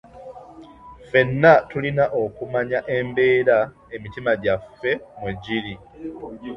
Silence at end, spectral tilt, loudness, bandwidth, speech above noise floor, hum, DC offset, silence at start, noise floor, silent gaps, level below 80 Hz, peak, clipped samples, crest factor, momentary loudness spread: 0 s; -8 dB/octave; -21 LUFS; 6.2 kHz; 23 dB; none; under 0.1%; 0.15 s; -44 dBFS; none; -52 dBFS; -2 dBFS; under 0.1%; 20 dB; 20 LU